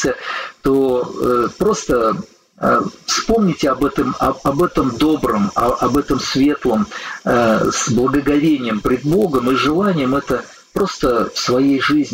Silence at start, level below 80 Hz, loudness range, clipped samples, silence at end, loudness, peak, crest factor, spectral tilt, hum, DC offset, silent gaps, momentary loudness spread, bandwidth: 0 s; -38 dBFS; 1 LU; under 0.1%; 0 s; -17 LUFS; -2 dBFS; 14 dB; -5 dB/octave; none; under 0.1%; none; 5 LU; 16 kHz